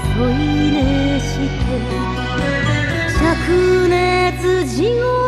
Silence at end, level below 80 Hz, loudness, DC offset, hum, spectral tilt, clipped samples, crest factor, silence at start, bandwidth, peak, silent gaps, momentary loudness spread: 0 s; -26 dBFS; -16 LUFS; under 0.1%; none; -6 dB/octave; under 0.1%; 12 dB; 0 s; 13.5 kHz; -4 dBFS; none; 6 LU